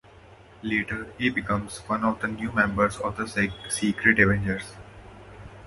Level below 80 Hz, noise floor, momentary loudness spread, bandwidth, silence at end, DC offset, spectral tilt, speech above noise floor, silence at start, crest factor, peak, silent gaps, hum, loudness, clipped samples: -46 dBFS; -50 dBFS; 14 LU; 11.5 kHz; 0 s; under 0.1%; -5 dB/octave; 25 dB; 0.3 s; 24 dB; -4 dBFS; none; none; -25 LUFS; under 0.1%